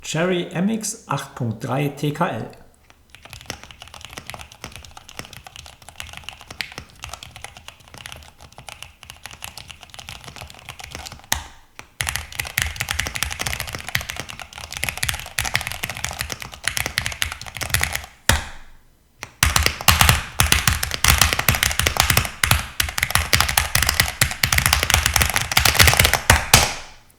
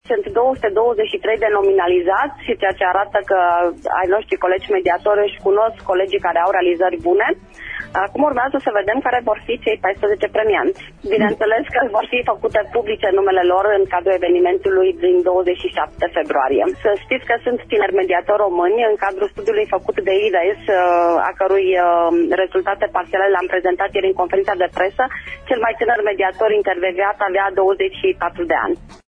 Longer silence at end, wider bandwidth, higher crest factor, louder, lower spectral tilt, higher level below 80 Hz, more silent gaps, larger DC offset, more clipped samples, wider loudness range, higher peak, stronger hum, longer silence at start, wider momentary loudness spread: about the same, 0.2 s vs 0.2 s; first, over 20 kHz vs 6.4 kHz; first, 22 dB vs 14 dB; about the same, -19 LUFS vs -17 LUFS; second, -2.5 dB/octave vs -6 dB/octave; first, -34 dBFS vs -46 dBFS; neither; neither; neither; first, 20 LU vs 2 LU; about the same, 0 dBFS vs -2 dBFS; neither; about the same, 0 s vs 0.1 s; first, 22 LU vs 5 LU